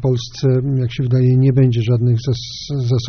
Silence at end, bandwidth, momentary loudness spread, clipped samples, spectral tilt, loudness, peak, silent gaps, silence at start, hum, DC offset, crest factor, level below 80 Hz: 0 s; 6.6 kHz; 9 LU; under 0.1%; -8.5 dB/octave; -16 LUFS; -4 dBFS; none; 0 s; none; under 0.1%; 12 dB; -42 dBFS